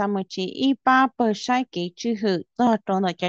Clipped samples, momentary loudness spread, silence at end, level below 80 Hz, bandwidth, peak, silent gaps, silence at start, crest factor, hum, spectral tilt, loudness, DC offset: under 0.1%; 9 LU; 0 s; -70 dBFS; 7.8 kHz; -6 dBFS; none; 0 s; 16 dB; none; -5.5 dB/octave; -23 LUFS; under 0.1%